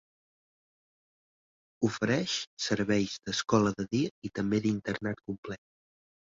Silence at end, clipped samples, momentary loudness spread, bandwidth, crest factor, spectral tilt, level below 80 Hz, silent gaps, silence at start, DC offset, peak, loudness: 0.75 s; under 0.1%; 12 LU; 7.8 kHz; 20 dB; -5 dB/octave; -62 dBFS; 2.47-2.57 s, 4.11-4.22 s, 5.38-5.43 s; 1.8 s; under 0.1%; -12 dBFS; -31 LUFS